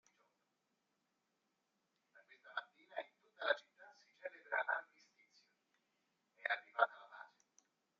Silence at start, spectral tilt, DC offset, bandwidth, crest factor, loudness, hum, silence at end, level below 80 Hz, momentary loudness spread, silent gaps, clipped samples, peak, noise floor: 2.45 s; 4 dB/octave; under 0.1%; 7.4 kHz; 30 dB; -42 LUFS; none; 0.75 s; under -90 dBFS; 20 LU; none; under 0.1%; -16 dBFS; -86 dBFS